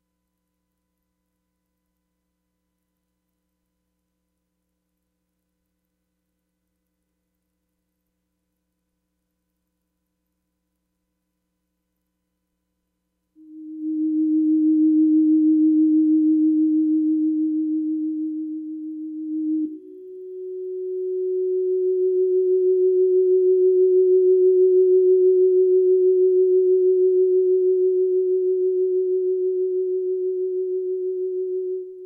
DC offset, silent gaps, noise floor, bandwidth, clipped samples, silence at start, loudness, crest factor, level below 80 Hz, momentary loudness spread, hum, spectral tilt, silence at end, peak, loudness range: under 0.1%; none; -77 dBFS; 0.5 kHz; under 0.1%; 13.5 s; -19 LUFS; 10 dB; -84 dBFS; 13 LU; none; -12 dB/octave; 0 s; -10 dBFS; 11 LU